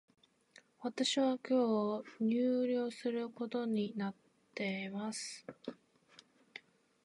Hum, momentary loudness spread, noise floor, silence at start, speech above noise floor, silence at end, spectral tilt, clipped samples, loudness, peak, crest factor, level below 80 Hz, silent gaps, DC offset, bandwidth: none; 18 LU; -66 dBFS; 0.8 s; 30 dB; 0.45 s; -4.5 dB/octave; under 0.1%; -36 LUFS; -22 dBFS; 16 dB; -88 dBFS; none; under 0.1%; 11.5 kHz